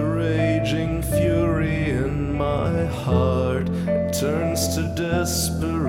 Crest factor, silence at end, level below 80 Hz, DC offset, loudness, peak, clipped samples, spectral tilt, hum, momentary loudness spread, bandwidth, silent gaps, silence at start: 14 dB; 0 s; -34 dBFS; under 0.1%; -22 LUFS; -6 dBFS; under 0.1%; -5.5 dB/octave; none; 3 LU; 16.5 kHz; none; 0 s